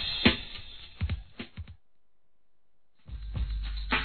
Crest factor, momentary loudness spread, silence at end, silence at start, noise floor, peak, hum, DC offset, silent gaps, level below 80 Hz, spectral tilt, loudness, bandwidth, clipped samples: 28 dB; 21 LU; 0 s; 0 s; -78 dBFS; -6 dBFS; none; 0.2%; none; -40 dBFS; -7.5 dB/octave; -32 LUFS; 4.6 kHz; under 0.1%